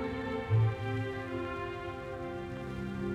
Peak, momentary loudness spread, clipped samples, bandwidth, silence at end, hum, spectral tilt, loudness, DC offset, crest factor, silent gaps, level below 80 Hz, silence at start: -18 dBFS; 10 LU; under 0.1%; 8 kHz; 0 s; none; -8 dB/octave; -35 LUFS; under 0.1%; 16 dB; none; -52 dBFS; 0 s